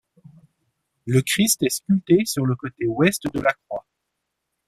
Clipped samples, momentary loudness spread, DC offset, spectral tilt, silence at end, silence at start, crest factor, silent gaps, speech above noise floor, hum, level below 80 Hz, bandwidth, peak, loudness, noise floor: under 0.1%; 13 LU; under 0.1%; -4.5 dB/octave; 0.85 s; 1.05 s; 20 dB; none; 58 dB; none; -56 dBFS; 15.5 kHz; -4 dBFS; -21 LUFS; -79 dBFS